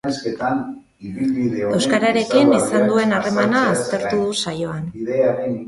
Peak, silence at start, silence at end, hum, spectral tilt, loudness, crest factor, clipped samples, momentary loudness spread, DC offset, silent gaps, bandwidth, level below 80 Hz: -2 dBFS; 0.05 s; 0 s; none; -5 dB/octave; -19 LUFS; 18 dB; under 0.1%; 10 LU; under 0.1%; none; 11.5 kHz; -54 dBFS